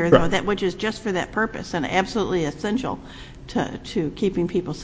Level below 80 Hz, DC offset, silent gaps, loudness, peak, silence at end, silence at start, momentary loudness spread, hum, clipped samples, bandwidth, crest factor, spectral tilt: -42 dBFS; under 0.1%; none; -24 LUFS; 0 dBFS; 0 s; 0 s; 6 LU; none; under 0.1%; 8 kHz; 22 dB; -5.5 dB/octave